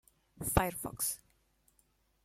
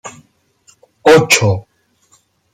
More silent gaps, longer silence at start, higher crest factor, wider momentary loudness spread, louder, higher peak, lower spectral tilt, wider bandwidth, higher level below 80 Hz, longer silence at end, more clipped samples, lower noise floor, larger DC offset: neither; first, 0.35 s vs 0.05 s; first, 28 dB vs 16 dB; second, 9 LU vs 16 LU; second, -35 LUFS vs -11 LUFS; second, -12 dBFS vs 0 dBFS; about the same, -4 dB/octave vs -4 dB/octave; about the same, 16.5 kHz vs 16.5 kHz; about the same, -50 dBFS vs -52 dBFS; about the same, 1.05 s vs 0.95 s; neither; first, -73 dBFS vs -55 dBFS; neither